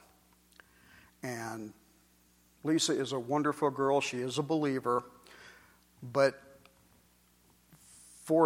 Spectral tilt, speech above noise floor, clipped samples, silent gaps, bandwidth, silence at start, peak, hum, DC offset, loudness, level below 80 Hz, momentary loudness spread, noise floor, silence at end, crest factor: -4.5 dB/octave; 35 dB; under 0.1%; none; 16.5 kHz; 1.25 s; -12 dBFS; none; under 0.1%; -32 LUFS; -74 dBFS; 24 LU; -66 dBFS; 0 s; 22 dB